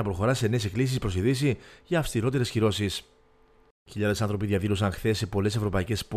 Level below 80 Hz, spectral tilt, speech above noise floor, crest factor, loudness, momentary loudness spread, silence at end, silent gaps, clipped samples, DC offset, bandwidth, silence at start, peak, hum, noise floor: -46 dBFS; -6 dB/octave; 33 dB; 16 dB; -27 LUFS; 4 LU; 0 s; 3.71-3.86 s; under 0.1%; under 0.1%; 14.5 kHz; 0 s; -12 dBFS; none; -59 dBFS